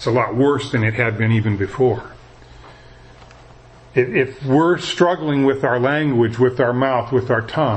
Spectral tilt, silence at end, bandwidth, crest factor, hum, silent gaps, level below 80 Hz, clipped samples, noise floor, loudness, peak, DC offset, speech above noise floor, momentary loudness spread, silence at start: -7 dB/octave; 0 s; 8.6 kHz; 18 dB; none; none; -48 dBFS; under 0.1%; -44 dBFS; -18 LUFS; -2 dBFS; under 0.1%; 27 dB; 3 LU; 0 s